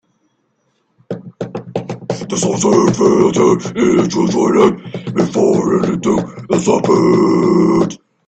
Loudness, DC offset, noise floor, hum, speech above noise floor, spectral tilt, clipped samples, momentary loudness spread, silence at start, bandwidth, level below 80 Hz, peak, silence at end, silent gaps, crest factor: -14 LUFS; under 0.1%; -63 dBFS; none; 51 dB; -6 dB/octave; under 0.1%; 13 LU; 1.1 s; 9 kHz; -50 dBFS; 0 dBFS; 0.3 s; none; 14 dB